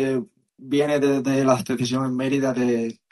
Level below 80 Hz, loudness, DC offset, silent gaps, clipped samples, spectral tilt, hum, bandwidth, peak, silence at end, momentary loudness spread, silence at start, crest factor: -64 dBFS; -22 LUFS; under 0.1%; none; under 0.1%; -6 dB/octave; none; 12.5 kHz; -4 dBFS; 0.2 s; 6 LU; 0 s; 18 dB